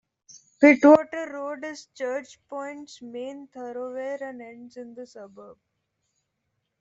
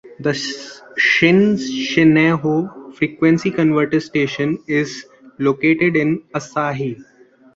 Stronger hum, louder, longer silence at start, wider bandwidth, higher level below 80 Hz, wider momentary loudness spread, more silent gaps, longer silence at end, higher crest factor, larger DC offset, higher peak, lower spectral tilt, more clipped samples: neither; second, -22 LUFS vs -17 LUFS; first, 0.6 s vs 0.05 s; about the same, 7.8 kHz vs 7.8 kHz; second, -72 dBFS vs -56 dBFS; first, 25 LU vs 13 LU; neither; first, 1.3 s vs 0.5 s; first, 22 dB vs 16 dB; neither; second, -4 dBFS vs 0 dBFS; about the same, -5 dB/octave vs -6 dB/octave; neither